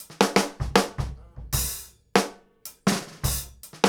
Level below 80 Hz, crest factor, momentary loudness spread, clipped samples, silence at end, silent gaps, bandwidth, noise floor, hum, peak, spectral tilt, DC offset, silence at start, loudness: -40 dBFS; 24 dB; 17 LU; under 0.1%; 0 s; none; over 20 kHz; -47 dBFS; none; -4 dBFS; -4 dB/octave; under 0.1%; 0 s; -26 LUFS